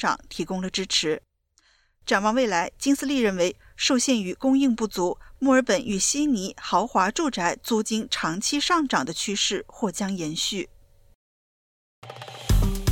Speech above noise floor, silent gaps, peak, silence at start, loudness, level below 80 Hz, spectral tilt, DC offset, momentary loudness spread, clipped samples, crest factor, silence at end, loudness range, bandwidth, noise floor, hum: 40 dB; 11.15-12.02 s; -8 dBFS; 0 s; -24 LUFS; -38 dBFS; -3.5 dB/octave; under 0.1%; 8 LU; under 0.1%; 16 dB; 0 s; 5 LU; 17 kHz; -64 dBFS; none